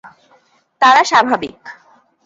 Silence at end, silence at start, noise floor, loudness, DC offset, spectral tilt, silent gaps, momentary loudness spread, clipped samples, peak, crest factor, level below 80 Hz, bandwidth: 0.55 s; 0.8 s; -54 dBFS; -12 LUFS; under 0.1%; -2 dB/octave; none; 11 LU; under 0.1%; 0 dBFS; 16 dB; -60 dBFS; 8 kHz